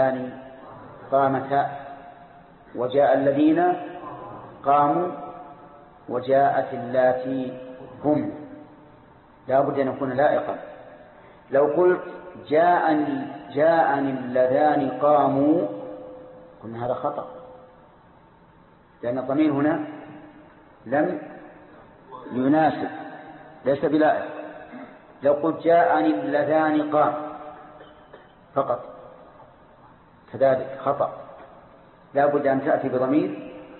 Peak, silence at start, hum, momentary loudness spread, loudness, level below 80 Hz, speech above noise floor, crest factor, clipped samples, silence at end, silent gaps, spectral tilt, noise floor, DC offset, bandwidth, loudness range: -8 dBFS; 0 s; none; 22 LU; -22 LUFS; -64 dBFS; 32 dB; 16 dB; under 0.1%; 0 s; none; -11 dB/octave; -53 dBFS; under 0.1%; 4.3 kHz; 7 LU